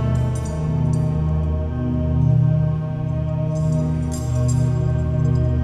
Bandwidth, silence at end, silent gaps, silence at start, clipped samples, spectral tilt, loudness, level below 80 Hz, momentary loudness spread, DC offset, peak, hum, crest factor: 11 kHz; 0 s; none; 0 s; under 0.1%; -8.5 dB/octave; -21 LUFS; -30 dBFS; 6 LU; under 0.1%; -8 dBFS; none; 12 dB